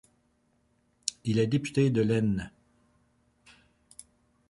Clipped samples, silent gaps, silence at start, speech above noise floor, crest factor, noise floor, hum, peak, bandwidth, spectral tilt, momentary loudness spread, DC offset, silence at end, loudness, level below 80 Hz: under 0.1%; none; 1.05 s; 44 dB; 26 dB; -70 dBFS; none; -6 dBFS; 11.5 kHz; -6 dB/octave; 25 LU; under 0.1%; 2 s; -28 LUFS; -58 dBFS